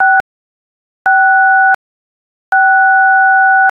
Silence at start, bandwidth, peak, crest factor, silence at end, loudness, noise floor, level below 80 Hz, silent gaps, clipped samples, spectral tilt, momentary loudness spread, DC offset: 0 s; 3.5 kHz; 0 dBFS; 10 dB; 0.05 s; -9 LUFS; under -90 dBFS; -62 dBFS; 0.20-1.05 s, 1.75-2.52 s; under 0.1%; -2.5 dB/octave; 7 LU; under 0.1%